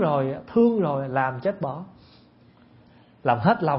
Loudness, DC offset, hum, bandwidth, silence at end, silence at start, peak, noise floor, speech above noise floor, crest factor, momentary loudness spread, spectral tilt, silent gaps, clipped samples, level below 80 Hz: -24 LUFS; under 0.1%; none; 5.8 kHz; 0 s; 0 s; -4 dBFS; -54 dBFS; 32 dB; 20 dB; 11 LU; -12 dB/octave; none; under 0.1%; -62 dBFS